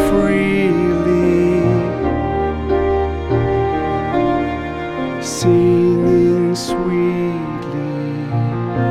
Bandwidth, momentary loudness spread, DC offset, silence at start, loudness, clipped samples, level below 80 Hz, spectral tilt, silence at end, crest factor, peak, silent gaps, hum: 13.5 kHz; 9 LU; 0.3%; 0 s; -17 LUFS; under 0.1%; -32 dBFS; -7 dB/octave; 0 s; 14 dB; -2 dBFS; none; none